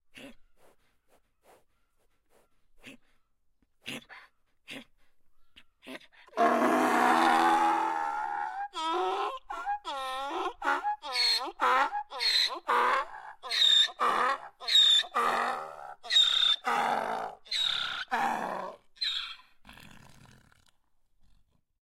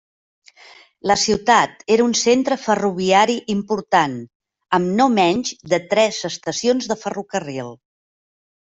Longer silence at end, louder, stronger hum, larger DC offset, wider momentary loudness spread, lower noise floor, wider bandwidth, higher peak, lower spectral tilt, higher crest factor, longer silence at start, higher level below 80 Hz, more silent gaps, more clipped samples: first, 1.85 s vs 0.95 s; second, -27 LUFS vs -18 LUFS; neither; neither; first, 21 LU vs 10 LU; first, -70 dBFS vs -47 dBFS; first, 16 kHz vs 8.2 kHz; second, -12 dBFS vs -2 dBFS; second, -1 dB/octave vs -3.5 dB/octave; about the same, 20 dB vs 16 dB; second, 0.15 s vs 1.05 s; second, -66 dBFS vs -58 dBFS; second, none vs 4.35-4.40 s; neither